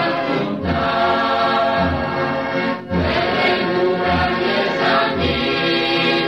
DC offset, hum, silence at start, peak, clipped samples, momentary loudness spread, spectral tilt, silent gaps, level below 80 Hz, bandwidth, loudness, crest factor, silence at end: 0.2%; none; 0 s; -4 dBFS; under 0.1%; 4 LU; -6.5 dB/octave; none; -38 dBFS; 11 kHz; -18 LUFS; 14 dB; 0 s